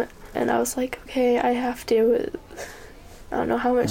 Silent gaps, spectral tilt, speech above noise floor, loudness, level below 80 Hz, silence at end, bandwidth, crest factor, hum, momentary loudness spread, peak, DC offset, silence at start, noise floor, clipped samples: none; -4.5 dB/octave; 21 dB; -24 LUFS; -48 dBFS; 0 s; 17 kHz; 14 dB; none; 17 LU; -10 dBFS; under 0.1%; 0 s; -43 dBFS; under 0.1%